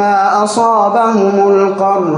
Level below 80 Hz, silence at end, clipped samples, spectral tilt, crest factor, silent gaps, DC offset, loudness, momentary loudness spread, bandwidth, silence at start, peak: -64 dBFS; 0 s; under 0.1%; -5.5 dB/octave; 10 dB; none; under 0.1%; -11 LUFS; 2 LU; 10.5 kHz; 0 s; -2 dBFS